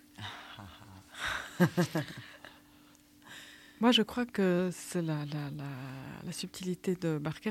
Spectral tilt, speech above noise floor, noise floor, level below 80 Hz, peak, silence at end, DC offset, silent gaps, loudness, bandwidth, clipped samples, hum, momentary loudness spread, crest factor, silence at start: -5 dB/octave; 28 dB; -60 dBFS; -66 dBFS; -12 dBFS; 0 s; under 0.1%; none; -33 LUFS; 16.5 kHz; under 0.1%; none; 22 LU; 22 dB; 0.2 s